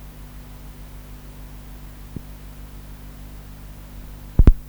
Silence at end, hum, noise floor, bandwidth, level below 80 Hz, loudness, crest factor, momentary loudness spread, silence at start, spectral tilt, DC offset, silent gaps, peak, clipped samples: 0 s; 50 Hz at -40 dBFS; -39 dBFS; over 20 kHz; -24 dBFS; -29 LUFS; 22 dB; 13 LU; 0 s; -8 dB/octave; under 0.1%; none; 0 dBFS; under 0.1%